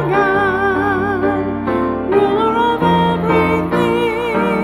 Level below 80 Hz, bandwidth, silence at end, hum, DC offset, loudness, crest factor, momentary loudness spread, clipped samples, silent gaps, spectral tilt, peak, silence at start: -40 dBFS; 15.5 kHz; 0 s; none; under 0.1%; -15 LUFS; 12 dB; 4 LU; under 0.1%; none; -7.5 dB/octave; -2 dBFS; 0 s